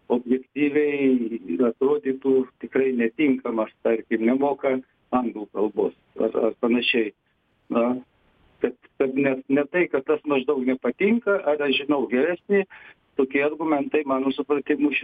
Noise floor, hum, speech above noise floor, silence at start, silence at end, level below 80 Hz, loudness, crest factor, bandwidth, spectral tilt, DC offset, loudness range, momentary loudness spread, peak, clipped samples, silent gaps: -61 dBFS; none; 38 dB; 0.1 s; 0 s; -66 dBFS; -23 LUFS; 14 dB; 4.9 kHz; -8 dB/octave; under 0.1%; 3 LU; 6 LU; -8 dBFS; under 0.1%; none